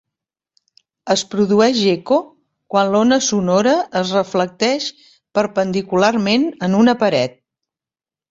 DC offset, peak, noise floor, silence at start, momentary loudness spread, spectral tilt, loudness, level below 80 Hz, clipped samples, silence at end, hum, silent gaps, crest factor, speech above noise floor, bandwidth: under 0.1%; -2 dBFS; under -90 dBFS; 1.05 s; 7 LU; -4.5 dB/octave; -17 LUFS; -58 dBFS; under 0.1%; 1 s; none; none; 16 dB; over 74 dB; 8 kHz